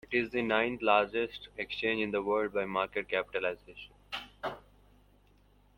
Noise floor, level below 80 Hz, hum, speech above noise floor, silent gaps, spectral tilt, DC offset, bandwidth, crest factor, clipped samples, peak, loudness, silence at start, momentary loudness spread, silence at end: -64 dBFS; -62 dBFS; 50 Hz at -60 dBFS; 32 dB; none; -6 dB/octave; under 0.1%; 16.5 kHz; 22 dB; under 0.1%; -12 dBFS; -32 LUFS; 0.1 s; 14 LU; 1.2 s